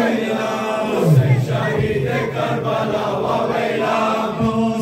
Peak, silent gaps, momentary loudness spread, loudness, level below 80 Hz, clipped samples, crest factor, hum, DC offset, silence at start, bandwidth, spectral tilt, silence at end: -4 dBFS; none; 6 LU; -19 LUFS; -46 dBFS; under 0.1%; 14 dB; none; under 0.1%; 0 s; 16 kHz; -7 dB/octave; 0 s